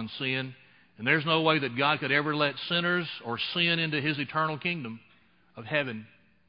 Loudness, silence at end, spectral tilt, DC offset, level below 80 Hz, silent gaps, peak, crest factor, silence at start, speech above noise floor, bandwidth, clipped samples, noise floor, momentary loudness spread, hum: -27 LUFS; 0.45 s; -9 dB/octave; under 0.1%; -72 dBFS; none; -8 dBFS; 20 dB; 0 s; 34 dB; 5.4 kHz; under 0.1%; -63 dBFS; 12 LU; none